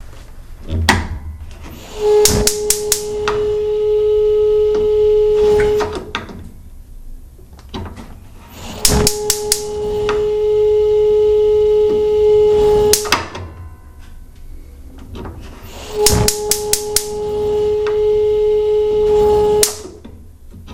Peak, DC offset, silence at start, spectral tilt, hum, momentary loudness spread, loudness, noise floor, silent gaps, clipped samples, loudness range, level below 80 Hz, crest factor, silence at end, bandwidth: 0 dBFS; under 0.1%; 0 s; -3 dB/octave; none; 20 LU; -14 LUFS; -37 dBFS; none; under 0.1%; 7 LU; -32 dBFS; 16 dB; 0 s; 16 kHz